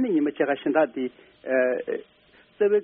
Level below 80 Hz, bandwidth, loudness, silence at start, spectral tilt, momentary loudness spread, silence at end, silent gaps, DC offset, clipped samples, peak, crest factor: -72 dBFS; 3.9 kHz; -25 LUFS; 0 s; -4 dB/octave; 11 LU; 0 s; none; under 0.1%; under 0.1%; -8 dBFS; 18 dB